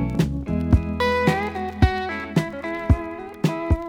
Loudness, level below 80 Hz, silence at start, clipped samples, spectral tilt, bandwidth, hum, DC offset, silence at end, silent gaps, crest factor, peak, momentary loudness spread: -23 LUFS; -30 dBFS; 0 s; under 0.1%; -7 dB/octave; 16.5 kHz; none; under 0.1%; 0 s; none; 20 dB; -2 dBFS; 7 LU